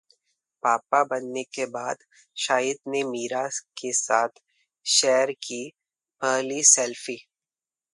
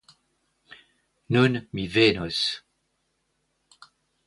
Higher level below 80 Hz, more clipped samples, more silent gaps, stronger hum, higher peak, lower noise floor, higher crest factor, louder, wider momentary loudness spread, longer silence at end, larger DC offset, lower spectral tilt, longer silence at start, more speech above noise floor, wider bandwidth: second, -82 dBFS vs -56 dBFS; neither; neither; neither; first, 0 dBFS vs -6 dBFS; first, under -90 dBFS vs -74 dBFS; about the same, 26 dB vs 22 dB; about the same, -24 LUFS vs -23 LUFS; first, 16 LU vs 9 LU; second, 0.75 s vs 1.7 s; neither; second, -0.5 dB/octave vs -5.5 dB/octave; second, 0.65 s vs 1.3 s; first, over 65 dB vs 51 dB; about the same, 11.5 kHz vs 11.5 kHz